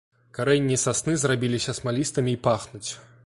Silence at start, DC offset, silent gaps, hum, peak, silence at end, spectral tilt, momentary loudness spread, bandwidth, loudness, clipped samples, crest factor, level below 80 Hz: 0.35 s; under 0.1%; none; none; -8 dBFS; 0.25 s; -4.5 dB/octave; 12 LU; 11.5 kHz; -24 LUFS; under 0.1%; 18 dB; -56 dBFS